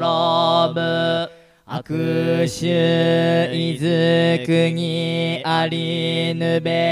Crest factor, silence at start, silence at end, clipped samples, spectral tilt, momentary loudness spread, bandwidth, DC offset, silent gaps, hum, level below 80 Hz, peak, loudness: 14 dB; 0 s; 0 s; under 0.1%; -6 dB/octave; 6 LU; 12 kHz; under 0.1%; none; none; -60 dBFS; -4 dBFS; -19 LUFS